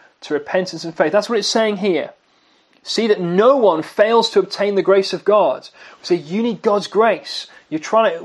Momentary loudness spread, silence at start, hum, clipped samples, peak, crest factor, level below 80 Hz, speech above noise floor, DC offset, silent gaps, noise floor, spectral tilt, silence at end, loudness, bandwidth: 13 LU; 0.25 s; none; under 0.1%; 0 dBFS; 18 dB; -72 dBFS; 40 dB; under 0.1%; none; -57 dBFS; -4.5 dB/octave; 0 s; -17 LUFS; 12 kHz